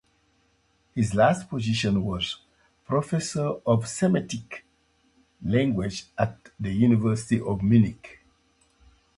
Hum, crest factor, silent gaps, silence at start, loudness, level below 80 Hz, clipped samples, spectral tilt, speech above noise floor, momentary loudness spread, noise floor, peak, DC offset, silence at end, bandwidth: none; 20 dB; none; 0.95 s; -25 LUFS; -50 dBFS; under 0.1%; -6 dB/octave; 42 dB; 14 LU; -67 dBFS; -6 dBFS; under 0.1%; 1.05 s; 11.5 kHz